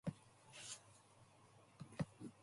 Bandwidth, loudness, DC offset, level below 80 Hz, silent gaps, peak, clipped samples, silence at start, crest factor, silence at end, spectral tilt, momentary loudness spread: 11.5 kHz; -53 LUFS; under 0.1%; -76 dBFS; none; -32 dBFS; under 0.1%; 0.05 s; 22 dB; 0 s; -5 dB/octave; 18 LU